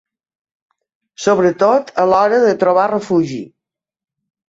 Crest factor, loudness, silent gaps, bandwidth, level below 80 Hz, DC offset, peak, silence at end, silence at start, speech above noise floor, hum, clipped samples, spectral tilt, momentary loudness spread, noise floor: 14 dB; -14 LUFS; none; 8 kHz; -58 dBFS; under 0.1%; -2 dBFS; 1 s; 1.2 s; 74 dB; none; under 0.1%; -6 dB/octave; 7 LU; -88 dBFS